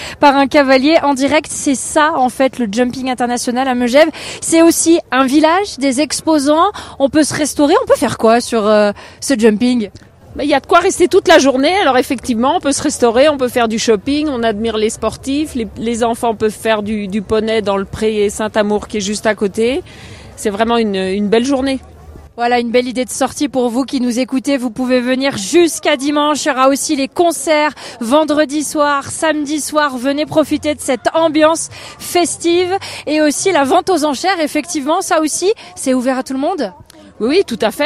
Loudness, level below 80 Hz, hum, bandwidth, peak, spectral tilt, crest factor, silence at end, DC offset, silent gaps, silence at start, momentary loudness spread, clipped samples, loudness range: -14 LUFS; -46 dBFS; none; 15 kHz; 0 dBFS; -3.5 dB/octave; 14 dB; 0 s; under 0.1%; none; 0 s; 7 LU; 0.1%; 4 LU